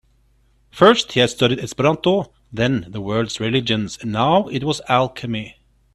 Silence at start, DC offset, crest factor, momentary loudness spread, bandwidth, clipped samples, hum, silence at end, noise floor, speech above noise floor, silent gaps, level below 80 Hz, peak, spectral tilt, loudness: 0.75 s; under 0.1%; 20 dB; 11 LU; 13 kHz; under 0.1%; none; 0.45 s; -58 dBFS; 40 dB; none; -50 dBFS; 0 dBFS; -5 dB/octave; -19 LUFS